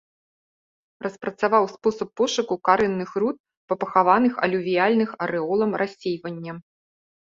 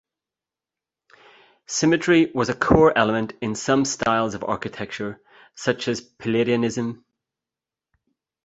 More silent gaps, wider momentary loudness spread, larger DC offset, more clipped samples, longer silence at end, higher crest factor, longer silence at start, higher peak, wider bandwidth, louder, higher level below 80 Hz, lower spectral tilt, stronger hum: first, 3.40-3.44 s, 3.57-3.68 s vs none; about the same, 14 LU vs 13 LU; neither; neither; second, 0.8 s vs 1.5 s; about the same, 20 dB vs 22 dB; second, 1 s vs 1.7 s; about the same, -4 dBFS vs -2 dBFS; about the same, 7.6 kHz vs 8.2 kHz; about the same, -23 LUFS vs -22 LUFS; second, -64 dBFS vs -46 dBFS; about the same, -5.5 dB/octave vs -4.5 dB/octave; neither